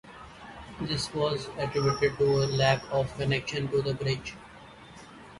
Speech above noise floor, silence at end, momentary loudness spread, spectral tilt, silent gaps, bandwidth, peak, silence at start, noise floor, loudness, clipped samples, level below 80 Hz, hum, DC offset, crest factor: 21 dB; 0 s; 23 LU; -5.5 dB/octave; none; 11.5 kHz; -12 dBFS; 0.05 s; -49 dBFS; -28 LUFS; under 0.1%; -52 dBFS; none; under 0.1%; 18 dB